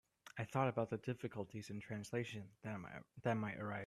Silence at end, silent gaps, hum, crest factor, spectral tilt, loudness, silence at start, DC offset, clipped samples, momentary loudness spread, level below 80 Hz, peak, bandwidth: 0 s; none; none; 20 dB; -6.5 dB/octave; -44 LUFS; 0.25 s; under 0.1%; under 0.1%; 11 LU; -76 dBFS; -24 dBFS; 13.5 kHz